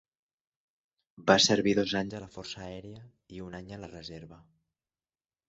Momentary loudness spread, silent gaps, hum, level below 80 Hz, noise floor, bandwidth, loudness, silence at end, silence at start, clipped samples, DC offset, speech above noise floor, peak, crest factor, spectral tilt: 23 LU; none; none; -62 dBFS; under -90 dBFS; 8 kHz; -26 LUFS; 1.1 s; 1.2 s; under 0.1%; under 0.1%; over 59 dB; -6 dBFS; 26 dB; -3.5 dB/octave